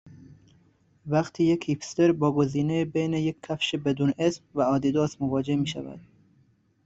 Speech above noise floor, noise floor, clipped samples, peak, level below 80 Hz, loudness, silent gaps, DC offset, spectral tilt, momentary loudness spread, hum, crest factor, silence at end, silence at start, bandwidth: 39 dB; -64 dBFS; under 0.1%; -10 dBFS; -60 dBFS; -26 LUFS; none; under 0.1%; -6.5 dB/octave; 6 LU; none; 16 dB; 0.85 s; 0.05 s; 8 kHz